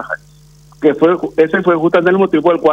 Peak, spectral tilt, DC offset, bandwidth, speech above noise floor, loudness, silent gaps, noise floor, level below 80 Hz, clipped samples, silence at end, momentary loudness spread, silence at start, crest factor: 0 dBFS; -8 dB/octave; under 0.1%; 8 kHz; 31 dB; -13 LUFS; none; -43 dBFS; -52 dBFS; under 0.1%; 0 s; 4 LU; 0 s; 12 dB